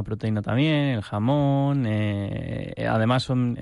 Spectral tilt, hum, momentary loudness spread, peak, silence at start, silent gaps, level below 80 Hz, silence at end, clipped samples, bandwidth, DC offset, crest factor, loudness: -8 dB/octave; none; 7 LU; -10 dBFS; 0 s; none; -50 dBFS; 0 s; under 0.1%; 11 kHz; under 0.1%; 14 dB; -24 LUFS